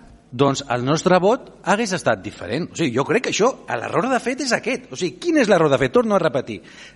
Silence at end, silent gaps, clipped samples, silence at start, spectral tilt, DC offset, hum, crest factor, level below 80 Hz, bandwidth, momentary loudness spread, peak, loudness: 0.05 s; none; under 0.1%; 0.3 s; -5 dB/octave; under 0.1%; none; 16 dB; -54 dBFS; 11.5 kHz; 10 LU; -4 dBFS; -20 LUFS